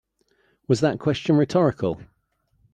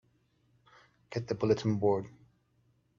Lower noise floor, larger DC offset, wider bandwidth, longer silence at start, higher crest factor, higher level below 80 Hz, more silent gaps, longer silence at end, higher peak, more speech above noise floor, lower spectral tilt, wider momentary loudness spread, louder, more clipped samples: about the same, -68 dBFS vs -71 dBFS; neither; first, 9.6 kHz vs 7.4 kHz; second, 0.7 s vs 1.1 s; about the same, 18 dB vs 20 dB; first, -56 dBFS vs -68 dBFS; neither; second, 0.7 s vs 0.9 s; first, -6 dBFS vs -14 dBFS; first, 47 dB vs 41 dB; about the same, -7 dB/octave vs -7.5 dB/octave; second, 9 LU vs 12 LU; first, -22 LUFS vs -32 LUFS; neither